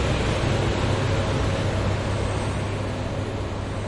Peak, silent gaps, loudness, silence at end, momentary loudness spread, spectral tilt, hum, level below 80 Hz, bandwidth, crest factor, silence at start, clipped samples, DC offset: -10 dBFS; none; -25 LUFS; 0 s; 5 LU; -6 dB/octave; none; -32 dBFS; 11.5 kHz; 14 dB; 0 s; under 0.1%; under 0.1%